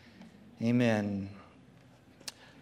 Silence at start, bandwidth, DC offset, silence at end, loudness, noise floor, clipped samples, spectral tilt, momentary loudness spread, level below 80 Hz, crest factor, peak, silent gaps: 0.2 s; 13.5 kHz; under 0.1%; 0.3 s; -31 LUFS; -58 dBFS; under 0.1%; -6.5 dB/octave; 26 LU; -74 dBFS; 20 dB; -14 dBFS; none